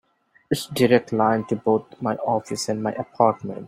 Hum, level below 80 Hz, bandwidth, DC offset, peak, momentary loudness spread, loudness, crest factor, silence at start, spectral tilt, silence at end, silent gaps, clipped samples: none; -62 dBFS; 16 kHz; under 0.1%; -2 dBFS; 9 LU; -22 LUFS; 20 dB; 0.5 s; -5.5 dB/octave; 0 s; none; under 0.1%